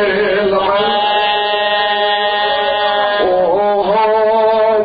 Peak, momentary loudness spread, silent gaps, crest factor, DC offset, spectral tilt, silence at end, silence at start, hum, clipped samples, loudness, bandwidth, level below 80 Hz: -2 dBFS; 2 LU; none; 10 dB; under 0.1%; -7 dB/octave; 0 s; 0 s; none; under 0.1%; -13 LUFS; 5 kHz; -48 dBFS